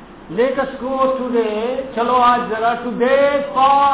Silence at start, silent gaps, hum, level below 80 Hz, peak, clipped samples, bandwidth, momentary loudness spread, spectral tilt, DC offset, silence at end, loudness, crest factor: 0 s; none; none; -48 dBFS; -4 dBFS; under 0.1%; 4 kHz; 8 LU; -8.5 dB/octave; 0.2%; 0 s; -17 LUFS; 12 dB